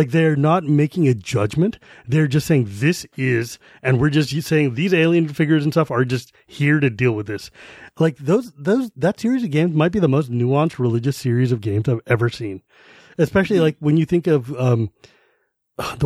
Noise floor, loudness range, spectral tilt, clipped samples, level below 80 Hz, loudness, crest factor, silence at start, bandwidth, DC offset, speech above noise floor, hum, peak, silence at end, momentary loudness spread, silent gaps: -66 dBFS; 2 LU; -7 dB/octave; under 0.1%; -52 dBFS; -19 LUFS; 16 dB; 0 s; 14.5 kHz; under 0.1%; 48 dB; none; -2 dBFS; 0 s; 9 LU; none